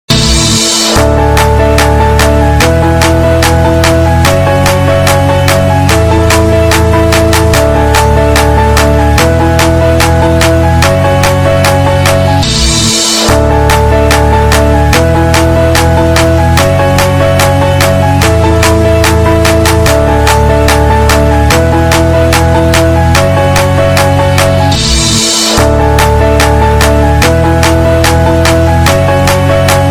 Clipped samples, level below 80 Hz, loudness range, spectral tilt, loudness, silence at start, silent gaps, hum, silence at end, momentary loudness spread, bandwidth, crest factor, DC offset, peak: 0.6%; -14 dBFS; 0 LU; -5 dB/octave; -7 LUFS; 0.1 s; none; none; 0 s; 1 LU; 19.5 kHz; 6 dB; under 0.1%; 0 dBFS